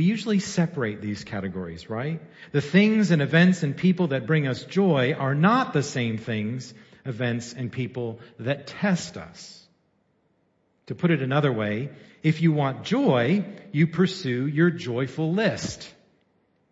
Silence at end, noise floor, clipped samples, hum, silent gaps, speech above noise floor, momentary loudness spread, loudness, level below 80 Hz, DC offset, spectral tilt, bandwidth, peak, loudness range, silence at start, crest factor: 0.8 s; -68 dBFS; under 0.1%; none; none; 44 dB; 15 LU; -24 LUFS; -64 dBFS; under 0.1%; -6.5 dB/octave; 8 kHz; -6 dBFS; 8 LU; 0 s; 20 dB